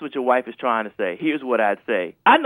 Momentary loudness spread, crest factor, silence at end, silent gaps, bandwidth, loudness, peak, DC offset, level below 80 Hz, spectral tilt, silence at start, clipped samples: 5 LU; 18 dB; 0 s; none; 11.5 kHz; -22 LUFS; -2 dBFS; under 0.1%; -72 dBFS; -5.5 dB/octave; 0 s; under 0.1%